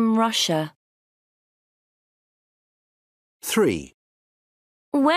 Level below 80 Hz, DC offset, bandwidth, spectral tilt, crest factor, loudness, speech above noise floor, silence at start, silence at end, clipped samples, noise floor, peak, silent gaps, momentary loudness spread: -62 dBFS; under 0.1%; 15.5 kHz; -4 dB/octave; 18 dB; -22 LUFS; over 68 dB; 0 s; 0 s; under 0.1%; under -90 dBFS; -8 dBFS; 0.76-3.40 s, 3.94-4.92 s; 13 LU